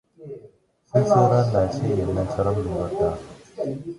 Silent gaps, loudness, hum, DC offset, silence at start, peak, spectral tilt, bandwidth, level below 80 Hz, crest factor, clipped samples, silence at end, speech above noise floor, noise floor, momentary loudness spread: none; -22 LUFS; none; under 0.1%; 0.2 s; -4 dBFS; -8 dB/octave; 11.5 kHz; -42 dBFS; 18 dB; under 0.1%; 0 s; 31 dB; -52 dBFS; 23 LU